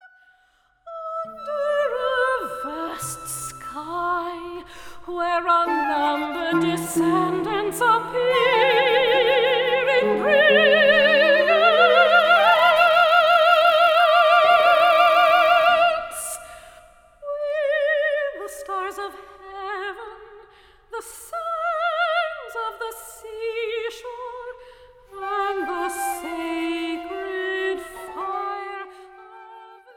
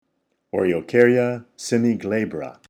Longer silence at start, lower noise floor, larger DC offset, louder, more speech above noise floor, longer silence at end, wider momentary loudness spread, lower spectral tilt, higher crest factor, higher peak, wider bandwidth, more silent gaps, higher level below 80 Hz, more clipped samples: first, 0.85 s vs 0.55 s; second, -62 dBFS vs -72 dBFS; neither; about the same, -19 LUFS vs -21 LUFS; second, 40 dB vs 51 dB; first, 0.3 s vs 0.15 s; first, 19 LU vs 12 LU; second, -3 dB/octave vs -6 dB/octave; about the same, 18 dB vs 20 dB; about the same, -4 dBFS vs -2 dBFS; first, 18 kHz vs 12.5 kHz; neither; first, -58 dBFS vs -64 dBFS; neither